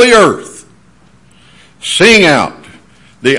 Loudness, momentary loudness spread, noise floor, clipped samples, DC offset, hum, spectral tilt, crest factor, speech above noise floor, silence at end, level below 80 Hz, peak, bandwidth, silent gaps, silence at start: -8 LUFS; 18 LU; -45 dBFS; 1%; under 0.1%; none; -3.5 dB/octave; 12 dB; 38 dB; 0 s; -44 dBFS; 0 dBFS; 12 kHz; none; 0 s